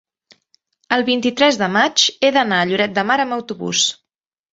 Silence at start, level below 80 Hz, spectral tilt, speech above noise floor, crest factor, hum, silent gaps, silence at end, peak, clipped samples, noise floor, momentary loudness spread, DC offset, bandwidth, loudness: 0.9 s; -62 dBFS; -2.5 dB/octave; 68 dB; 16 dB; none; none; 0.6 s; -2 dBFS; under 0.1%; -85 dBFS; 6 LU; under 0.1%; 8 kHz; -16 LUFS